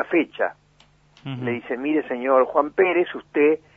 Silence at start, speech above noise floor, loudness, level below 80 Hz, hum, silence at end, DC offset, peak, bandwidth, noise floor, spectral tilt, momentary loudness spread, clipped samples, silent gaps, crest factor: 0 s; 36 dB; -22 LUFS; -64 dBFS; 50 Hz at -60 dBFS; 0.2 s; under 0.1%; -4 dBFS; 4.8 kHz; -57 dBFS; -8.5 dB/octave; 9 LU; under 0.1%; none; 18 dB